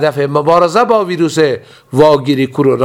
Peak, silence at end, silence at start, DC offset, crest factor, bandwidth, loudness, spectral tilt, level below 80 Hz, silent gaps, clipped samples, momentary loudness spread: 0 dBFS; 0 s; 0 s; under 0.1%; 12 dB; 15.5 kHz; -11 LUFS; -6 dB/octave; -48 dBFS; none; 0.3%; 5 LU